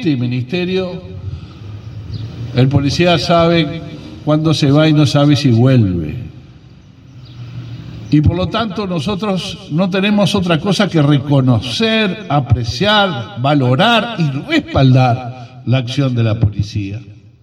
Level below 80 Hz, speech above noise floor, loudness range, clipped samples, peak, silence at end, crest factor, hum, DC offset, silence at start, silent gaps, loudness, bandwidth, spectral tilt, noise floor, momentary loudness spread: -40 dBFS; 27 dB; 5 LU; under 0.1%; 0 dBFS; 0.25 s; 14 dB; none; under 0.1%; 0 s; none; -14 LUFS; 11 kHz; -6.5 dB/octave; -40 dBFS; 18 LU